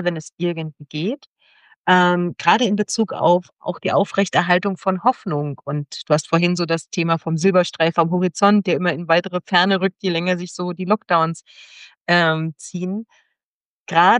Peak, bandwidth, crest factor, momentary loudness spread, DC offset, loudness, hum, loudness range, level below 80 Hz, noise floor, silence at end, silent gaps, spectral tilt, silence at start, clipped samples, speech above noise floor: -2 dBFS; 10.5 kHz; 18 dB; 10 LU; under 0.1%; -19 LUFS; none; 3 LU; -68 dBFS; under -90 dBFS; 0 s; 0.33-0.38 s, 1.27-1.36 s, 1.76-1.84 s, 11.97-12.05 s, 13.44-13.86 s; -5 dB/octave; 0 s; under 0.1%; over 71 dB